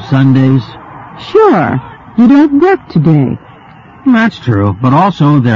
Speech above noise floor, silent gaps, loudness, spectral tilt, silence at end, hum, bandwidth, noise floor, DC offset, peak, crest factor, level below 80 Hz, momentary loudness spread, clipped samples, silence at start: 28 dB; none; -9 LUFS; -9 dB/octave; 0 s; none; 7.2 kHz; -35 dBFS; under 0.1%; 0 dBFS; 10 dB; -44 dBFS; 13 LU; under 0.1%; 0 s